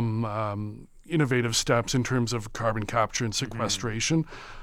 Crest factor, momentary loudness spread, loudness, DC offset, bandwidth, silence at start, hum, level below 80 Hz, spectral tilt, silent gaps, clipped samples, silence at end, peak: 18 dB; 8 LU; -27 LUFS; under 0.1%; 15.5 kHz; 0 s; none; -46 dBFS; -4.5 dB/octave; none; under 0.1%; 0 s; -8 dBFS